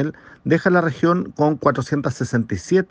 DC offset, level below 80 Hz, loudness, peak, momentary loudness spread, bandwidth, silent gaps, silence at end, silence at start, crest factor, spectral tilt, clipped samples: under 0.1%; -52 dBFS; -20 LUFS; -4 dBFS; 6 LU; 9.4 kHz; none; 0.05 s; 0 s; 16 dB; -7 dB/octave; under 0.1%